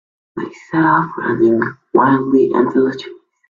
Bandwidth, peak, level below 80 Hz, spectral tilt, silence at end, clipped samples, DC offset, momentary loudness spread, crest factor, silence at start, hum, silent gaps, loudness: 7.2 kHz; 0 dBFS; -58 dBFS; -8.5 dB/octave; 0.35 s; under 0.1%; under 0.1%; 15 LU; 16 dB; 0.35 s; none; none; -15 LUFS